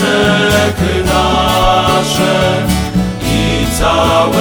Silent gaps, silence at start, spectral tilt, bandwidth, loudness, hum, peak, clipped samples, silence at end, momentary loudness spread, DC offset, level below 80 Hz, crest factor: none; 0 s; -4.5 dB/octave; over 20 kHz; -11 LUFS; none; 0 dBFS; under 0.1%; 0 s; 4 LU; under 0.1%; -24 dBFS; 12 dB